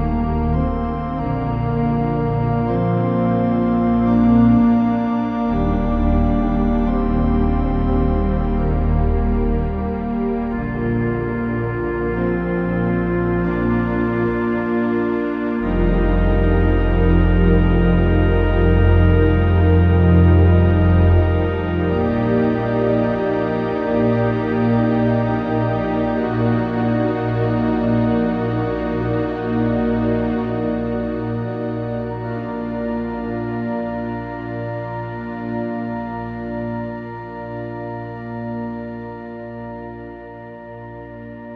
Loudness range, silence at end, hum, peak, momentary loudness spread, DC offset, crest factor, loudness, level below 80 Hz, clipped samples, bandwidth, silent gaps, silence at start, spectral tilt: 11 LU; 0 s; none; -2 dBFS; 13 LU; under 0.1%; 16 dB; -19 LUFS; -26 dBFS; under 0.1%; 5 kHz; none; 0 s; -10.5 dB/octave